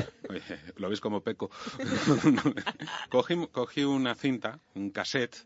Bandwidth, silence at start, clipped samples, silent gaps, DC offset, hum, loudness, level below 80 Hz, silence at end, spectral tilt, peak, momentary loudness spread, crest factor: 8 kHz; 0 s; under 0.1%; none; under 0.1%; none; -30 LUFS; -68 dBFS; 0.05 s; -5.5 dB/octave; -10 dBFS; 13 LU; 20 dB